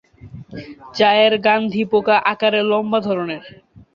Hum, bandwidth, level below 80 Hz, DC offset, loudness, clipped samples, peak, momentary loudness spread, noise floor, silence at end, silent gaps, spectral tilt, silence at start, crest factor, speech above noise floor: none; 7 kHz; -56 dBFS; under 0.1%; -16 LUFS; under 0.1%; -2 dBFS; 21 LU; -38 dBFS; 0.45 s; none; -6 dB/octave; 0.25 s; 16 dB; 21 dB